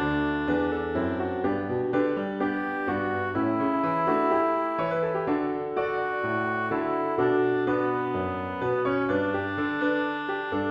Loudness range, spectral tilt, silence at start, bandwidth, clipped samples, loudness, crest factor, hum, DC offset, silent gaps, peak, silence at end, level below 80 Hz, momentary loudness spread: 1 LU; -8.5 dB/octave; 0 s; 5.6 kHz; under 0.1%; -27 LUFS; 14 dB; none; under 0.1%; none; -12 dBFS; 0 s; -54 dBFS; 4 LU